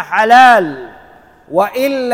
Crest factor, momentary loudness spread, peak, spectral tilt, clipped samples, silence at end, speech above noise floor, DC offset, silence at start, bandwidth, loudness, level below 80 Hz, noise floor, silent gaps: 12 dB; 16 LU; 0 dBFS; -4 dB/octave; 0.3%; 0 s; 32 dB; under 0.1%; 0 s; 16.5 kHz; -10 LUFS; -54 dBFS; -42 dBFS; none